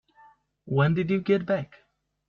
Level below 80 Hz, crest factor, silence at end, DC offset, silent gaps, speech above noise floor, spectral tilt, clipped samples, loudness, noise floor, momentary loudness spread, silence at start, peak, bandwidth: -62 dBFS; 16 dB; 0.65 s; under 0.1%; none; 33 dB; -9.5 dB/octave; under 0.1%; -25 LUFS; -58 dBFS; 6 LU; 0.65 s; -12 dBFS; 6.4 kHz